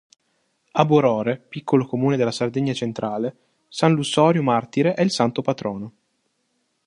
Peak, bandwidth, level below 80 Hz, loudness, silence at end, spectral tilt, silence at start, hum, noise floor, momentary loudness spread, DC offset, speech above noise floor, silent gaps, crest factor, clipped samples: 0 dBFS; 11 kHz; -64 dBFS; -21 LUFS; 1 s; -6 dB/octave; 0.75 s; none; -71 dBFS; 12 LU; under 0.1%; 50 dB; none; 20 dB; under 0.1%